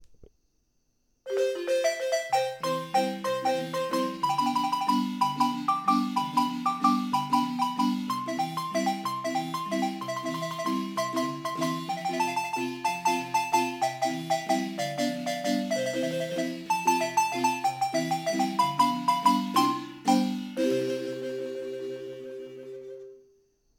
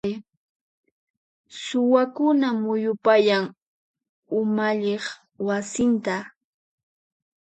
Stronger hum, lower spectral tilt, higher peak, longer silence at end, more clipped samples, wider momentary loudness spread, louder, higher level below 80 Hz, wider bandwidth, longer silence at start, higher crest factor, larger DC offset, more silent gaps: neither; about the same, -4 dB/octave vs -5 dB/octave; second, -10 dBFS vs -4 dBFS; second, 0.6 s vs 1.1 s; neither; second, 8 LU vs 14 LU; second, -28 LUFS vs -23 LUFS; second, -74 dBFS vs -66 dBFS; first, 18.5 kHz vs 9 kHz; about the same, 0 s vs 0.05 s; about the same, 18 dB vs 20 dB; neither; second, none vs 0.37-0.83 s, 0.92-1.44 s, 3.62-3.94 s, 4.09-4.23 s